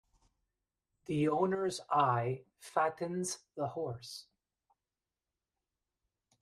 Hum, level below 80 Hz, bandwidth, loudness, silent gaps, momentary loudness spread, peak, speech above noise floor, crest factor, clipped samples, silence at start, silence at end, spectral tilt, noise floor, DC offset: none; -74 dBFS; 13.5 kHz; -35 LUFS; none; 14 LU; -16 dBFS; over 56 dB; 22 dB; under 0.1%; 1.1 s; 2.2 s; -5.5 dB/octave; under -90 dBFS; under 0.1%